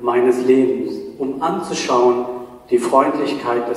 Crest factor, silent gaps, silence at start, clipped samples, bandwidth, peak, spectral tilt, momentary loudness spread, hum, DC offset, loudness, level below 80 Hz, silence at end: 16 dB; none; 0 s; under 0.1%; 12.5 kHz; 0 dBFS; -5 dB/octave; 11 LU; none; under 0.1%; -18 LUFS; -58 dBFS; 0 s